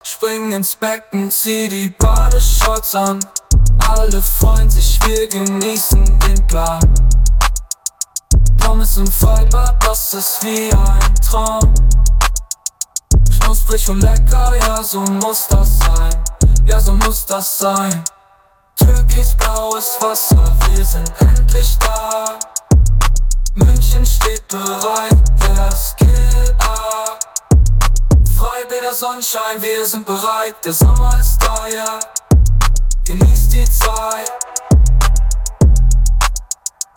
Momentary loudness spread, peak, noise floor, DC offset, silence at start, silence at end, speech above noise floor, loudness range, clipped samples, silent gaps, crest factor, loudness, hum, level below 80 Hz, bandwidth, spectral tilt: 7 LU; -2 dBFS; -51 dBFS; under 0.1%; 0.05 s; 0.45 s; 40 dB; 2 LU; under 0.1%; none; 8 dB; -14 LUFS; none; -12 dBFS; 19.5 kHz; -4.5 dB/octave